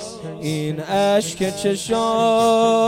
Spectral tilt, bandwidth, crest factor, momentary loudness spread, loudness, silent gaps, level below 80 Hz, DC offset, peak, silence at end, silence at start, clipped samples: -4.5 dB/octave; 16.5 kHz; 14 dB; 10 LU; -19 LUFS; none; -54 dBFS; under 0.1%; -6 dBFS; 0 s; 0 s; under 0.1%